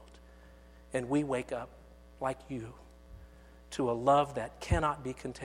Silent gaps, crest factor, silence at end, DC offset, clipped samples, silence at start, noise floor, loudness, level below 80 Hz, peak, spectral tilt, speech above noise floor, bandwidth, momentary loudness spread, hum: none; 20 dB; 0 s; under 0.1%; under 0.1%; 0 s; -55 dBFS; -33 LUFS; -48 dBFS; -14 dBFS; -6 dB/octave; 23 dB; 15 kHz; 17 LU; none